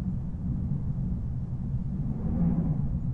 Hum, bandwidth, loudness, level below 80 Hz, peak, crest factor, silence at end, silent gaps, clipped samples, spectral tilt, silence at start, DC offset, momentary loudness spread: none; 2.5 kHz; -31 LUFS; -36 dBFS; -16 dBFS; 14 dB; 0 s; none; under 0.1%; -12 dB/octave; 0 s; under 0.1%; 6 LU